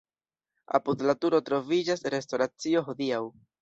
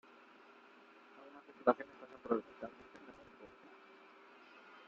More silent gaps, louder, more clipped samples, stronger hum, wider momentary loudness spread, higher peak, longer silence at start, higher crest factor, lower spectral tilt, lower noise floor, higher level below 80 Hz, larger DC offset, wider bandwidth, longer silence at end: neither; first, -28 LUFS vs -40 LUFS; neither; neither; second, 5 LU vs 25 LU; first, -8 dBFS vs -14 dBFS; second, 0.7 s vs 1.15 s; second, 20 dB vs 30 dB; about the same, -5 dB/octave vs -4 dB/octave; first, under -90 dBFS vs -62 dBFS; first, -72 dBFS vs -82 dBFS; neither; about the same, 8 kHz vs 7.4 kHz; first, 0.3 s vs 0.1 s